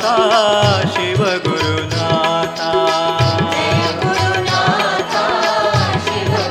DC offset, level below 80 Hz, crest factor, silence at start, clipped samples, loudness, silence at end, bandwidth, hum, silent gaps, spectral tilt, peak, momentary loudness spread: under 0.1%; -46 dBFS; 14 dB; 0 s; under 0.1%; -15 LUFS; 0 s; 14 kHz; none; none; -4.5 dB/octave; 0 dBFS; 5 LU